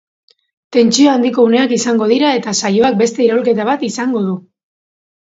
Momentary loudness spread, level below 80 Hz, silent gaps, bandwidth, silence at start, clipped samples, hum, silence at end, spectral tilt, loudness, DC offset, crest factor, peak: 7 LU; -60 dBFS; none; 8 kHz; 0.7 s; under 0.1%; none; 0.9 s; -4 dB/octave; -13 LUFS; under 0.1%; 14 dB; 0 dBFS